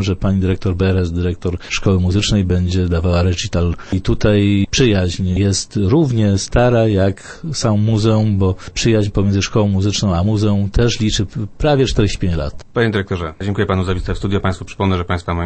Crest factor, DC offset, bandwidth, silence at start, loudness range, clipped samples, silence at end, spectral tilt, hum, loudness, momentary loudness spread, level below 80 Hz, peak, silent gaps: 14 dB; under 0.1%; 8.8 kHz; 0 s; 3 LU; under 0.1%; 0 s; -6 dB/octave; none; -16 LUFS; 6 LU; -28 dBFS; -2 dBFS; none